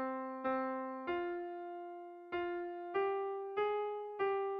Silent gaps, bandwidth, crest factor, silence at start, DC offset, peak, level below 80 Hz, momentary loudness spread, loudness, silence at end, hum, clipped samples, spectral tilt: none; 5 kHz; 14 dB; 0 s; under 0.1%; -26 dBFS; -76 dBFS; 9 LU; -39 LUFS; 0 s; none; under 0.1%; -2.5 dB/octave